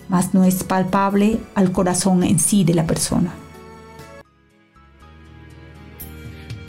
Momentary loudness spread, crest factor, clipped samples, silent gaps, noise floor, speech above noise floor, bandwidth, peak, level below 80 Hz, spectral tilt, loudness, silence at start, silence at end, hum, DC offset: 24 LU; 14 dB; under 0.1%; none; -55 dBFS; 38 dB; 16 kHz; -6 dBFS; -44 dBFS; -5.5 dB/octave; -18 LUFS; 0 s; 0 s; none; under 0.1%